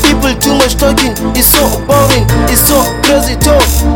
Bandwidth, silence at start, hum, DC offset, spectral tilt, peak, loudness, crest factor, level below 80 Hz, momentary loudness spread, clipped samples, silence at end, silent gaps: over 20 kHz; 0 s; none; under 0.1%; -4 dB/octave; 0 dBFS; -8 LUFS; 8 dB; -16 dBFS; 3 LU; 0.6%; 0 s; none